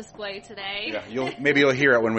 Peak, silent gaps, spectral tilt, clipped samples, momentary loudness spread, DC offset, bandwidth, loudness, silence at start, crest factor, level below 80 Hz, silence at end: -6 dBFS; none; -5 dB/octave; under 0.1%; 16 LU; under 0.1%; 8.4 kHz; -22 LUFS; 0 s; 18 dB; -60 dBFS; 0 s